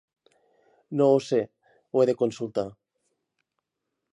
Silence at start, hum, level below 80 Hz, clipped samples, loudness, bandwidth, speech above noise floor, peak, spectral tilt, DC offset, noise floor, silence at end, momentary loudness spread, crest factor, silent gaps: 0.9 s; none; -72 dBFS; under 0.1%; -25 LUFS; 11 kHz; 59 dB; -10 dBFS; -7 dB/octave; under 0.1%; -83 dBFS; 1.4 s; 12 LU; 18 dB; none